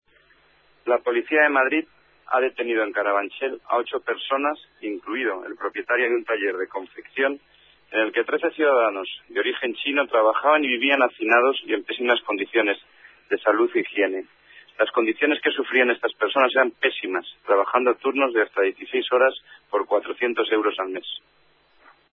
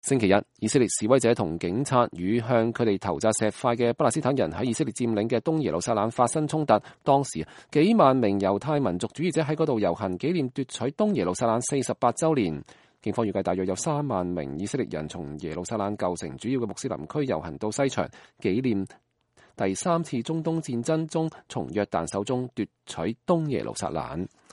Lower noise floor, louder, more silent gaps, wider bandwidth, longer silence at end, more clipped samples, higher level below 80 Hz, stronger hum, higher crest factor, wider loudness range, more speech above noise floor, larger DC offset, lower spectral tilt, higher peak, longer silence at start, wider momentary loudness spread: about the same, -59 dBFS vs -61 dBFS; first, -22 LUFS vs -26 LUFS; neither; second, 4.2 kHz vs 11.5 kHz; first, 0.95 s vs 0.25 s; neither; second, -74 dBFS vs -58 dBFS; neither; about the same, 18 dB vs 22 dB; about the same, 5 LU vs 6 LU; about the same, 36 dB vs 35 dB; neither; about the same, -5.5 dB/octave vs -5.5 dB/octave; about the same, -4 dBFS vs -4 dBFS; first, 0.85 s vs 0.05 s; about the same, 11 LU vs 9 LU